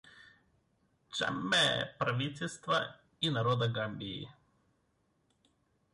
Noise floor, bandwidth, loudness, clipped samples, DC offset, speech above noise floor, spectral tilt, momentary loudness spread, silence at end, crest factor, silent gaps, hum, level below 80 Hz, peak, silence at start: -76 dBFS; 11.5 kHz; -33 LUFS; under 0.1%; under 0.1%; 42 dB; -4 dB/octave; 14 LU; 1.6 s; 18 dB; none; none; -68 dBFS; -20 dBFS; 0.05 s